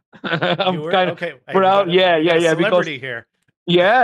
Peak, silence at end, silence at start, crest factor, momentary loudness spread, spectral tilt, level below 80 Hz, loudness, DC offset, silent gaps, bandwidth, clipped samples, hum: -4 dBFS; 0 s; 0.25 s; 12 dB; 13 LU; -5.5 dB/octave; -66 dBFS; -17 LUFS; under 0.1%; 3.57-3.66 s; 11.5 kHz; under 0.1%; none